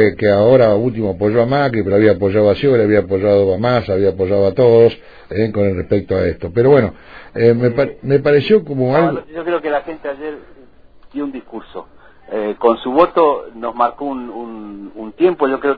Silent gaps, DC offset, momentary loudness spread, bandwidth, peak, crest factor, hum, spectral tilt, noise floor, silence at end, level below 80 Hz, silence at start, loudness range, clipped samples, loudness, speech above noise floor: none; 0.5%; 17 LU; 5 kHz; 0 dBFS; 14 dB; none; -10 dB/octave; -45 dBFS; 0 s; -44 dBFS; 0 s; 7 LU; under 0.1%; -15 LUFS; 30 dB